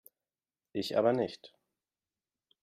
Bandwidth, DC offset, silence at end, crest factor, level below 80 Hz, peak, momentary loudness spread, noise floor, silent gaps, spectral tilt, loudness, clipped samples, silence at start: 15 kHz; under 0.1%; 1.15 s; 22 dB; -78 dBFS; -14 dBFS; 14 LU; under -90 dBFS; none; -6 dB/octave; -32 LUFS; under 0.1%; 0.75 s